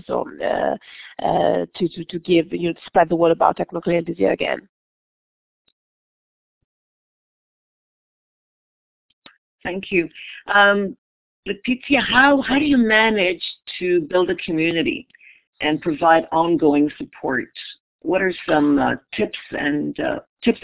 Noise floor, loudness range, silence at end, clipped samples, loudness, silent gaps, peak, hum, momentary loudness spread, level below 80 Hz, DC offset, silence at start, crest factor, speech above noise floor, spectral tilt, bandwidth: under -90 dBFS; 9 LU; 0.05 s; under 0.1%; -19 LUFS; 4.69-5.65 s, 5.72-9.22 s, 9.38-9.58 s, 10.98-11.43 s, 15.47-15.53 s, 17.80-17.99 s, 20.29-20.37 s; 0 dBFS; none; 14 LU; -54 dBFS; under 0.1%; 0.1 s; 20 dB; over 71 dB; -9 dB/octave; 4 kHz